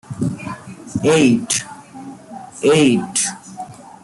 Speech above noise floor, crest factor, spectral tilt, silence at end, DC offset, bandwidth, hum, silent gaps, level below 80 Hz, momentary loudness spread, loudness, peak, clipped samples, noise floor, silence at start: 21 dB; 18 dB; -4 dB/octave; 0.2 s; under 0.1%; 12 kHz; none; none; -54 dBFS; 22 LU; -17 LUFS; -2 dBFS; under 0.1%; -36 dBFS; 0.1 s